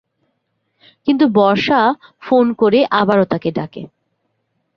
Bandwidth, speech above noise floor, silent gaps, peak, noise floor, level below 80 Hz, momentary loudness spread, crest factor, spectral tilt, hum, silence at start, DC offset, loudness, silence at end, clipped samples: 6.6 kHz; 55 dB; none; -2 dBFS; -69 dBFS; -58 dBFS; 13 LU; 14 dB; -7.5 dB/octave; none; 1.05 s; under 0.1%; -15 LUFS; 0.9 s; under 0.1%